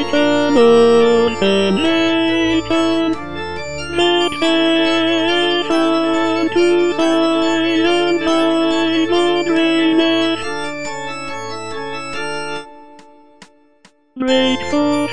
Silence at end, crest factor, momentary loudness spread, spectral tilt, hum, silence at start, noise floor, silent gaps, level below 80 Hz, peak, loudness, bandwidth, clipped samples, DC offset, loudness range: 0 s; 14 dB; 12 LU; -4.5 dB/octave; none; 0 s; -52 dBFS; none; -48 dBFS; -2 dBFS; -15 LUFS; 10 kHz; under 0.1%; 3%; 9 LU